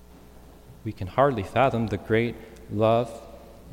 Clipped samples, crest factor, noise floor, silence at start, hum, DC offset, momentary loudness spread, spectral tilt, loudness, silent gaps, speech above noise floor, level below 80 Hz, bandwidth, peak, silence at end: under 0.1%; 20 dB; -48 dBFS; 0.35 s; none; under 0.1%; 17 LU; -7.5 dB/octave; -25 LUFS; none; 24 dB; -50 dBFS; 16.5 kHz; -8 dBFS; 0 s